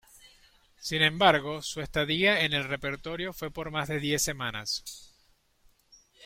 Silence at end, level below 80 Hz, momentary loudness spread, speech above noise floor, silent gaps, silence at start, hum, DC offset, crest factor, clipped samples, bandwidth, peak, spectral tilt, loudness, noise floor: 0 s; -54 dBFS; 12 LU; 38 dB; none; 0.25 s; none; under 0.1%; 24 dB; under 0.1%; 16.5 kHz; -6 dBFS; -3 dB/octave; -28 LUFS; -66 dBFS